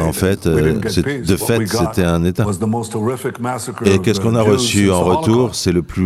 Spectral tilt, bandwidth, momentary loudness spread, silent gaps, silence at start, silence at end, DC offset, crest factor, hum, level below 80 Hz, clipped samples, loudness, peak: -5.5 dB/octave; 16 kHz; 7 LU; none; 0 s; 0 s; under 0.1%; 16 dB; none; -38 dBFS; under 0.1%; -16 LUFS; 0 dBFS